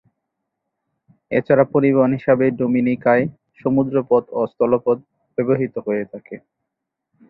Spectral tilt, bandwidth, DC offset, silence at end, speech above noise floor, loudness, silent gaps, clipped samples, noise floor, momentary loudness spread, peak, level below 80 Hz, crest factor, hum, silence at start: -12 dB/octave; 4.6 kHz; under 0.1%; 0.9 s; 63 dB; -19 LUFS; none; under 0.1%; -80 dBFS; 11 LU; -2 dBFS; -60 dBFS; 18 dB; none; 1.3 s